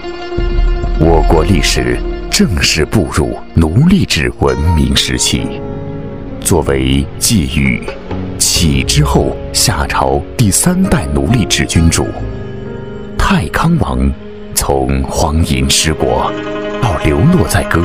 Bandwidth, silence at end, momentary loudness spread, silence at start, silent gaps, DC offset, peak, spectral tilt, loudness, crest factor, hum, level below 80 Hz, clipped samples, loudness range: 16.5 kHz; 0 s; 12 LU; 0 s; none; 3%; 0 dBFS; -4.5 dB/octave; -12 LUFS; 12 dB; none; -20 dBFS; under 0.1%; 3 LU